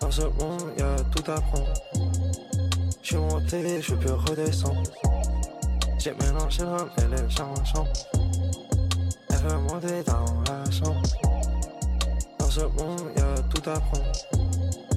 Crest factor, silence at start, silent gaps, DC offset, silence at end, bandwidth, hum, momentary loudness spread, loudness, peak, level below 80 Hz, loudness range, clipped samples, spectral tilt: 14 dB; 0 s; none; under 0.1%; 0 s; 15 kHz; none; 4 LU; -27 LUFS; -10 dBFS; -28 dBFS; 1 LU; under 0.1%; -5.5 dB/octave